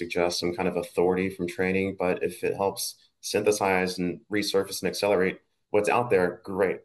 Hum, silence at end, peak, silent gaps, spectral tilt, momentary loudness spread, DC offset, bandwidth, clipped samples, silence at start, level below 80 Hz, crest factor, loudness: none; 0.05 s; -8 dBFS; none; -4.5 dB/octave; 6 LU; under 0.1%; 12.5 kHz; under 0.1%; 0 s; -64 dBFS; 18 dB; -27 LUFS